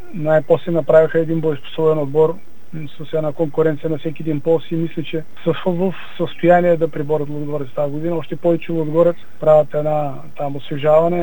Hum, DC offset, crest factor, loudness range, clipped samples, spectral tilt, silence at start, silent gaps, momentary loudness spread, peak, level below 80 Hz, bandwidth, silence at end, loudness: none; 6%; 18 dB; 3 LU; under 0.1%; -9 dB/octave; 0.05 s; none; 12 LU; 0 dBFS; -58 dBFS; 18 kHz; 0 s; -18 LUFS